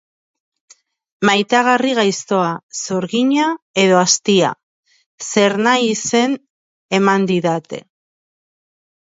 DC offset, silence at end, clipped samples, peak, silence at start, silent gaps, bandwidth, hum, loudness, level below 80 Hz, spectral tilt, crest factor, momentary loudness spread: under 0.1%; 1.35 s; under 0.1%; 0 dBFS; 1.2 s; 2.63-2.69 s, 3.62-3.74 s, 4.63-4.83 s, 5.06-5.18 s, 6.50-6.89 s; 8 kHz; none; -16 LUFS; -66 dBFS; -3.5 dB/octave; 18 dB; 10 LU